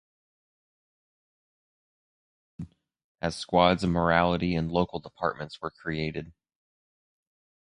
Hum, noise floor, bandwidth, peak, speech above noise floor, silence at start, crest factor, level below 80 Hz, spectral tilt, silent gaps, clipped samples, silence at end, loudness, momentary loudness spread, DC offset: none; under -90 dBFS; 11 kHz; -6 dBFS; over 63 dB; 2.6 s; 26 dB; -50 dBFS; -6.5 dB/octave; 3.04-3.15 s; under 0.1%; 1.35 s; -27 LUFS; 19 LU; under 0.1%